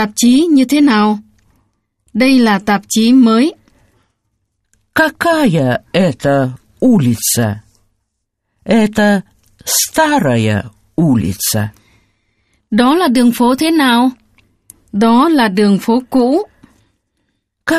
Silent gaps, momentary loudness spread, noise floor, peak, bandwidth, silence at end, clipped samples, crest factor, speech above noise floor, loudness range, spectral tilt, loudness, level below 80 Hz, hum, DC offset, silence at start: none; 10 LU; -71 dBFS; 0 dBFS; 15 kHz; 0 s; under 0.1%; 14 dB; 60 dB; 3 LU; -4.5 dB/octave; -12 LUFS; -48 dBFS; none; under 0.1%; 0 s